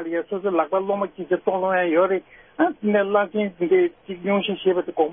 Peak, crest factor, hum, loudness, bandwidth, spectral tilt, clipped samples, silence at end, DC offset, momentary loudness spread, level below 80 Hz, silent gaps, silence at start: -6 dBFS; 16 dB; none; -22 LUFS; 3.7 kHz; -10.5 dB/octave; under 0.1%; 0 s; under 0.1%; 6 LU; -66 dBFS; none; 0 s